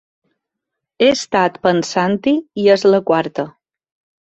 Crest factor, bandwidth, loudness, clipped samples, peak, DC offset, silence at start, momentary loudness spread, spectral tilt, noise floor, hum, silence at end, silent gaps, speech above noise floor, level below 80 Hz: 16 dB; 8.2 kHz; -16 LUFS; under 0.1%; 0 dBFS; under 0.1%; 1 s; 7 LU; -5 dB/octave; -80 dBFS; none; 0.85 s; none; 65 dB; -58 dBFS